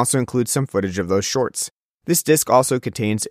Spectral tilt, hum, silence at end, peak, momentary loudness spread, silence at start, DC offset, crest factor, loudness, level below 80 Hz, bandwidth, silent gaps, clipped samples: -4.5 dB/octave; none; 0 s; -2 dBFS; 8 LU; 0 s; under 0.1%; 18 dB; -19 LUFS; -56 dBFS; 15.5 kHz; 1.71-1.98 s; under 0.1%